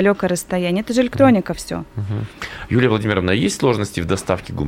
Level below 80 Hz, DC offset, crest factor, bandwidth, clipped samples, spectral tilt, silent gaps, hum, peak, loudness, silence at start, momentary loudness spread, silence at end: -44 dBFS; under 0.1%; 18 dB; 16.5 kHz; under 0.1%; -5.5 dB/octave; none; none; 0 dBFS; -19 LUFS; 0 s; 12 LU; 0 s